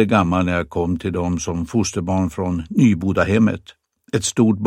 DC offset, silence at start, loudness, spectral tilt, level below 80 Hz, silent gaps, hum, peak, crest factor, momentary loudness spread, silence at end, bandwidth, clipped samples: under 0.1%; 0 s; -19 LUFS; -6 dB/octave; -42 dBFS; none; none; -2 dBFS; 18 dB; 6 LU; 0 s; 14 kHz; under 0.1%